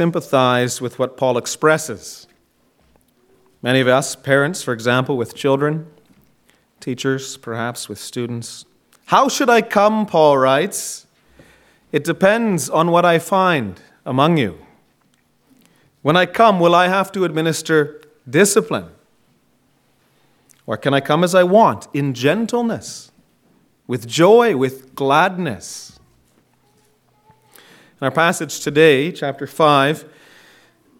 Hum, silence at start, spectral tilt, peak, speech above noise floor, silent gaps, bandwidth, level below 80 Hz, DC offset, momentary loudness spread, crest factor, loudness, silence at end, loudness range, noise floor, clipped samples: none; 0 s; -4.5 dB/octave; 0 dBFS; 44 dB; none; 17 kHz; -62 dBFS; under 0.1%; 15 LU; 18 dB; -17 LUFS; 0.95 s; 6 LU; -60 dBFS; under 0.1%